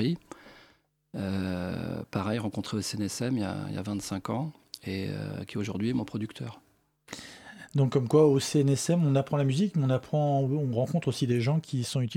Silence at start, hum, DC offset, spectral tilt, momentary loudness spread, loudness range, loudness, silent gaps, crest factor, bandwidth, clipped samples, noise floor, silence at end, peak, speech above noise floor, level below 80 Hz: 0 s; none; under 0.1%; -6.5 dB/octave; 16 LU; 9 LU; -29 LUFS; none; 18 dB; 16 kHz; under 0.1%; -64 dBFS; 0 s; -10 dBFS; 36 dB; -64 dBFS